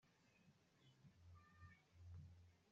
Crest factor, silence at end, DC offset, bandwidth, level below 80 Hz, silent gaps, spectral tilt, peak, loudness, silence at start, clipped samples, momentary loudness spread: 16 dB; 0 s; under 0.1%; 7.4 kHz; -82 dBFS; none; -6 dB/octave; -52 dBFS; -66 LUFS; 0 s; under 0.1%; 6 LU